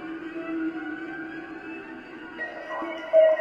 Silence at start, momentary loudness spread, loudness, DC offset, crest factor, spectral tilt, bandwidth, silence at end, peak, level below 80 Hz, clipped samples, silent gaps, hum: 0 s; 18 LU; -29 LUFS; under 0.1%; 18 dB; -6 dB/octave; 6 kHz; 0 s; -8 dBFS; -68 dBFS; under 0.1%; none; none